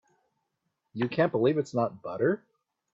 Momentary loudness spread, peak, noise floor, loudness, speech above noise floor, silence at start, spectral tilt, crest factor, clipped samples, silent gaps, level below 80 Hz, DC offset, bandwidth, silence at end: 9 LU; -12 dBFS; -81 dBFS; -28 LUFS; 53 dB; 0.95 s; -7.5 dB/octave; 18 dB; under 0.1%; none; -70 dBFS; under 0.1%; 7.8 kHz; 0.55 s